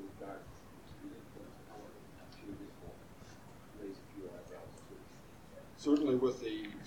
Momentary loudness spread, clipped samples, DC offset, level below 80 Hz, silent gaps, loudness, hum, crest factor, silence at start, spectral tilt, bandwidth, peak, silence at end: 22 LU; under 0.1%; under 0.1%; -66 dBFS; none; -39 LUFS; none; 22 dB; 0 s; -6 dB/octave; 18 kHz; -18 dBFS; 0 s